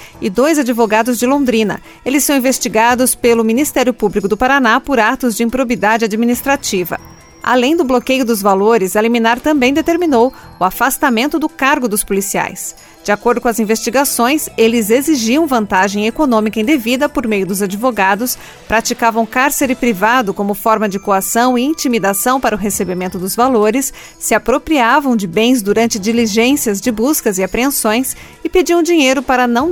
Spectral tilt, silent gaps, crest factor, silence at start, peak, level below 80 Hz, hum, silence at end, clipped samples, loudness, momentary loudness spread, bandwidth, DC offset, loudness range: -3.5 dB/octave; none; 14 dB; 0 s; 0 dBFS; -40 dBFS; none; 0 s; under 0.1%; -13 LUFS; 6 LU; 19 kHz; under 0.1%; 2 LU